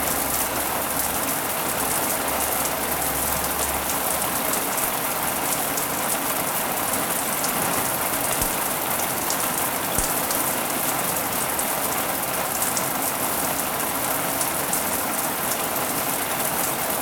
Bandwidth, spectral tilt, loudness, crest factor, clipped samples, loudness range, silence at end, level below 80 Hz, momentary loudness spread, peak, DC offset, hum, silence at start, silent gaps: 19 kHz; -2 dB/octave; -22 LUFS; 20 dB; under 0.1%; 1 LU; 0 s; -46 dBFS; 1 LU; -4 dBFS; under 0.1%; none; 0 s; none